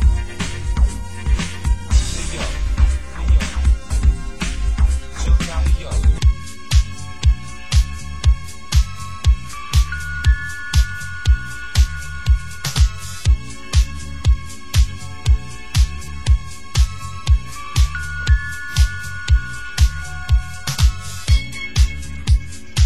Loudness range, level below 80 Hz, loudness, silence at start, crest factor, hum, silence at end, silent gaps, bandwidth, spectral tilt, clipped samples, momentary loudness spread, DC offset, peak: 1 LU; -18 dBFS; -21 LUFS; 0 s; 14 dB; none; 0 s; none; 12.5 kHz; -4 dB/octave; under 0.1%; 6 LU; 3%; -4 dBFS